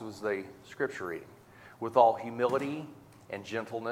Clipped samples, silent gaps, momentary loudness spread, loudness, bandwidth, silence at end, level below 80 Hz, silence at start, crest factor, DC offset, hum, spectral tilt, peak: under 0.1%; none; 18 LU; -31 LUFS; 16 kHz; 0 s; -74 dBFS; 0 s; 24 dB; under 0.1%; none; -6 dB/octave; -8 dBFS